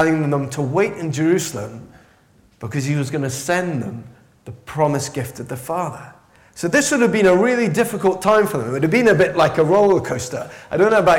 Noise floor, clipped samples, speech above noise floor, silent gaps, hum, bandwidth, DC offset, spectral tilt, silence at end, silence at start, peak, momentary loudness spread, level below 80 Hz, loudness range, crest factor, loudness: -54 dBFS; under 0.1%; 36 dB; none; none; 17 kHz; under 0.1%; -5.5 dB/octave; 0 s; 0 s; -6 dBFS; 15 LU; -54 dBFS; 8 LU; 12 dB; -18 LUFS